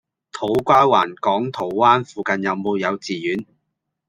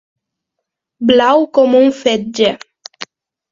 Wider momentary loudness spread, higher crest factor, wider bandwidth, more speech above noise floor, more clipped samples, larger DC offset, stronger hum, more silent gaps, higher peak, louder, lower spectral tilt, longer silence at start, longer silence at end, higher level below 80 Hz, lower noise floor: second, 11 LU vs 20 LU; about the same, 18 dB vs 14 dB; first, 15.5 kHz vs 7.6 kHz; second, 58 dB vs 66 dB; neither; neither; neither; neither; about the same, -2 dBFS vs 0 dBFS; second, -19 LUFS vs -12 LUFS; about the same, -5.5 dB/octave vs -4.5 dB/octave; second, 0.35 s vs 1 s; first, 0.65 s vs 0.5 s; about the same, -60 dBFS vs -56 dBFS; about the same, -76 dBFS vs -77 dBFS